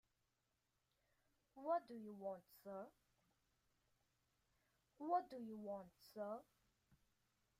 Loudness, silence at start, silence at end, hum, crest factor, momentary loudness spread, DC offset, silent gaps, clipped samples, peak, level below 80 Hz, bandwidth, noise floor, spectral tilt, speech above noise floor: -49 LUFS; 1.55 s; 0.65 s; none; 24 dB; 13 LU; under 0.1%; none; under 0.1%; -30 dBFS; -90 dBFS; 15.5 kHz; -88 dBFS; -7 dB/octave; 40 dB